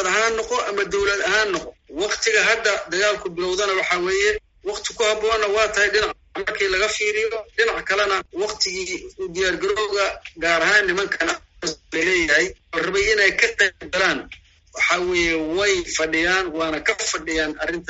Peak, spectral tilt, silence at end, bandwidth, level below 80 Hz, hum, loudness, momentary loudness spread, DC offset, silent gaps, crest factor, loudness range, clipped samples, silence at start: -2 dBFS; -0.5 dB/octave; 0.05 s; 8 kHz; -46 dBFS; none; -20 LUFS; 10 LU; under 0.1%; none; 20 dB; 2 LU; under 0.1%; 0 s